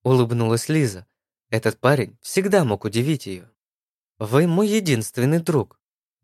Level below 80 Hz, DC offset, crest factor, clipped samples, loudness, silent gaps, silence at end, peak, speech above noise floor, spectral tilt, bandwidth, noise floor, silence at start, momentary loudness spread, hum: -64 dBFS; under 0.1%; 20 dB; under 0.1%; -21 LUFS; 3.58-4.15 s; 0.6 s; -2 dBFS; over 70 dB; -6 dB/octave; 15 kHz; under -90 dBFS; 0.05 s; 9 LU; none